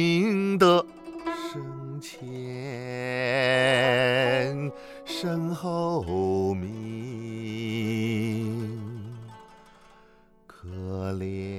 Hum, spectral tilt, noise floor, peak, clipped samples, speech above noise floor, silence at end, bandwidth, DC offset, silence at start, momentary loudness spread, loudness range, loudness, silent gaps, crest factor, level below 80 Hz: none; -6 dB/octave; -57 dBFS; -6 dBFS; under 0.1%; 33 dB; 0 s; 15.5 kHz; under 0.1%; 0 s; 17 LU; 8 LU; -27 LUFS; none; 22 dB; -62 dBFS